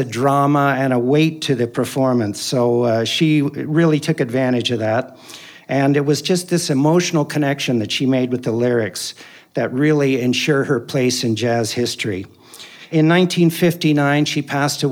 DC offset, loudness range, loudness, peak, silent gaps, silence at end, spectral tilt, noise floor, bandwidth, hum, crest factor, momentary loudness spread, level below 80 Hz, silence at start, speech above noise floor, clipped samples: under 0.1%; 1 LU; -17 LUFS; -2 dBFS; none; 0 s; -5.5 dB/octave; -40 dBFS; 19 kHz; none; 16 dB; 8 LU; -70 dBFS; 0 s; 23 dB; under 0.1%